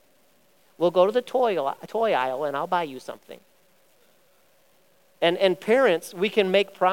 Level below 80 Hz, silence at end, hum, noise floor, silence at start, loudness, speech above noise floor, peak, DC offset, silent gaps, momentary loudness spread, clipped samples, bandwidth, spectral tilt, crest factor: -80 dBFS; 0 s; none; -62 dBFS; 0.8 s; -23 LUFS; 39 dB; -6 dBFS; 0.1%; none; 8 LU; under 0.1%; 17 kHz; -5 dB/octave; 18 dB